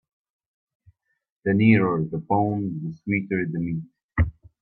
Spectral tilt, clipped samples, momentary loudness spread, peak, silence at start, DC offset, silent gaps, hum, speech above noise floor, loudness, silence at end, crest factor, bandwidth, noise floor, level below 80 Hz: -11 dB/octave; under 0.1%; 13 LU; -4 dBFS; 1.45 s; under 0.1%; 4.03-4.09 s; none; 38 dB; -24 LUFS; 0.3 s; 20 dB; 4.3 kHz; -60 dBFS; -42 dBFS